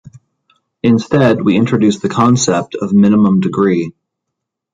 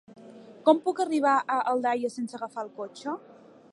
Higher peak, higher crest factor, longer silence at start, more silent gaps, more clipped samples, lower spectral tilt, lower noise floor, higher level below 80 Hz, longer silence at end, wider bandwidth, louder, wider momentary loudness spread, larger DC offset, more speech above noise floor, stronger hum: first, 0 dBFS vs -8 dBFS; second, 12 dB vs 20 dB; second, 0.05 s vs 0.2 s; neither; neither; first, -6 dB/octave vs -4.5 dB/octave; first, -77 dBFS vs -48 dBFS; first, -50 dBFS vs -86 dBFS; first, 0.85 s vs 0.55 s; second, 9.4 kHz vs 11.5 kHz; first, -12 LUFS vs -27 LUFS; second, 7 LU vs 13 LU; neither; first, 66 dB vs 22 dB; neither